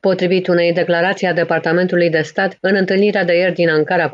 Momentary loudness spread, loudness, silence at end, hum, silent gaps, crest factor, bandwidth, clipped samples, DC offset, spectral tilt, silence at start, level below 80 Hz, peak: 2 LU; -15 LUFS; 0 s; none; none; 12 dB; 7.6 kHz; under 0.1%; under 0.1%; -6.5 dB/octave; 0.05 s; -64 dBFS; -4 dBFS